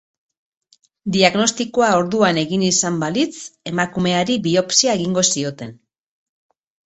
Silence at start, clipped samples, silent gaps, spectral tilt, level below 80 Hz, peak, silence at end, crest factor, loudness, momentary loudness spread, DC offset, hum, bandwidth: 1.05 s; under 0.1%; none; -3.5 dB/octave; -56 dBFS; 0 dBFS; 1.1 s; 20 dB; -17 LUFS; 11 LU; under 0.1%; none; 8.4 kHz